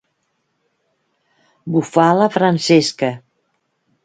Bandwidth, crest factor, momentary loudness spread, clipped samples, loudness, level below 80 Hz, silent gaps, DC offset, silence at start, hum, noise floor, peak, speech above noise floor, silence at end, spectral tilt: 9.4 kHz; 18 dB; 12 LU; under 0.1%; -15 LUFS; -64 dBFS; none; under 0.1%; 1.65 s; none; -69 dBFS; 0 dBFS; 54 dB; 0.85 s; -5.5 dB/octave